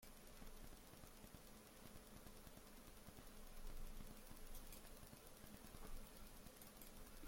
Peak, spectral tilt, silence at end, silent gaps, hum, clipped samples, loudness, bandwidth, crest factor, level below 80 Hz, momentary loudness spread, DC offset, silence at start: -42 dBFS; -3.5 dB/octave; 0 s; none; none; under 0.1%; -61 LUFS; 16.5 kHz; 16 dB; -60 dBFS; 3 LU; under 0.1%; 0 s